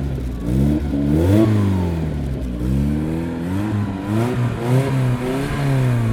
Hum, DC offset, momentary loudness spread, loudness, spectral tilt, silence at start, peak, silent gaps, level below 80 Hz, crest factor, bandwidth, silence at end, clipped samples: none; under 0.1%; 8 LU; -20 LUFS; -8 dB/octave; 0 s; -2 dBFS; none; -30 dBFS; 16 dB; 15.5 kHz; 0 s; under 0.1%